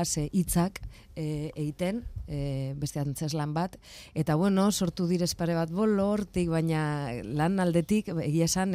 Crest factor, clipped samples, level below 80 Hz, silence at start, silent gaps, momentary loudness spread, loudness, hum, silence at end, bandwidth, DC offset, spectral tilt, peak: 16 dB; under 0.1%; -48 dBFS; 0 s; none; 9 LU; -29 LUFS; none; 0 s; 16 kHz; under 0.1%; -5.5 dB/octave; -12 dBFS